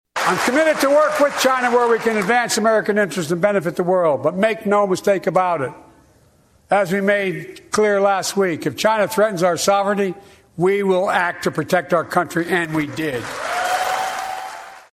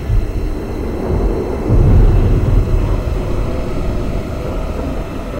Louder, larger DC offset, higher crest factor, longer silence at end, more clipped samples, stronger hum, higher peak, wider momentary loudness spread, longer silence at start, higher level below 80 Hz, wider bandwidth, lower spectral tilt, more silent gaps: about the same, -18 LUFS vs -17 LUFS; neither; about the same, 18 dB vs 14 dB; first, 0.2 s vs 0 s; neither; neither; about the same, -2 dBFS vs 0 dBFS; about the same, 8 LU vs 10 LU; first, 0.15 s vs 0 s; second, -60 dBFS vs -16 dBFS; first, 15.5 kHz vs 9 kHz; second, -4.5 dB/octave vs -8.5 dB/octave; neither